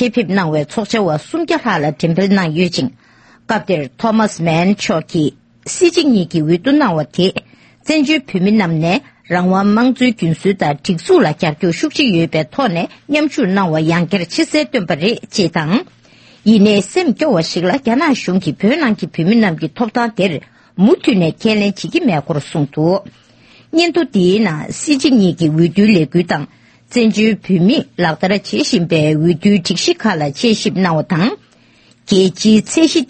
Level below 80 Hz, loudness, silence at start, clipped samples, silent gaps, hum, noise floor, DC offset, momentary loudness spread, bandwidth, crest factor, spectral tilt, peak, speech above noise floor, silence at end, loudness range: -52 dBFS; -14 LUFS; 0 s; under 0.1%; none; none; -49 dBFS; under 0.1%; 7 LU; 8.8 kHz; 14 dB; -5.5 dB/octave; 0 dBFS; 35 dB; 0.05 s; 2 LU